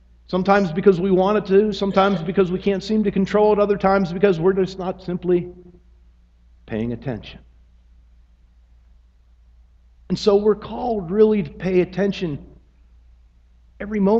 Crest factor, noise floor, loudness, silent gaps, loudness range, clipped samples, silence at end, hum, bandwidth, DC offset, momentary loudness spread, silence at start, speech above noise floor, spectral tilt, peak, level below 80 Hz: 20 dB; -53 dBFS; -20 LUFS; none; 15 LU; under 0.1%; 0 s; none; 7.6 kHz; under 0.1%; 12 LU; 0.3 s; 34 dB; -7.5 dB/octave; -2 dBFS; -46 dBFS